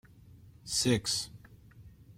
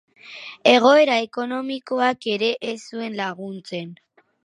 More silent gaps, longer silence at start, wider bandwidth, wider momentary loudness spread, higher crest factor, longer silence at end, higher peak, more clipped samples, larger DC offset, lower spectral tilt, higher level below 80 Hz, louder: neither; about the same, 0.25 s vs 0.25 s; first, 16.5 kHz vs 10.5 kHz; second, 16 LU vs 20 LU; about the same, 20 dB vs 20 dB; second, 0.05 s vs 0.5 s; second, -16 dBFS vs 0 dBFS; neither; neither; about the same, -3.5 dB/octave vs -4 dB/octave; first, -58 dBFS vs -78 dBFS; second, -30 LUFS vs -20 LUFS